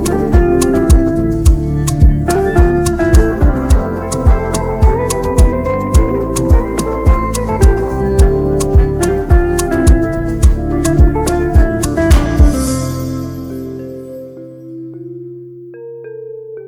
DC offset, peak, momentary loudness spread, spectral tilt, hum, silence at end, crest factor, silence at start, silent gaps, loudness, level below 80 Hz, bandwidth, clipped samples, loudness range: under 0.1%; 0 dBFS; 17 LU; -6.5 dB/octave; none; 0 s; 12 dB; 0 s; none; -13 LUFS; -14 dBFS; 15.5 kHz; under 0.1%; 6 LU